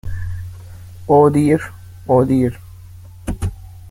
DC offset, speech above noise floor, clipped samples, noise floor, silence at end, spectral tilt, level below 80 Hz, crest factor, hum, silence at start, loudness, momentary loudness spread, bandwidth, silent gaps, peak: under 0.1%; 24 dB; under 0.1%; -37 dBFS; 0 s; -8.5 dB/octave; -36 dBFS; 16 dB; none; 0.05 s; -16 LUFS; 22 LU; 16.5 kHz; none; -2 dBFS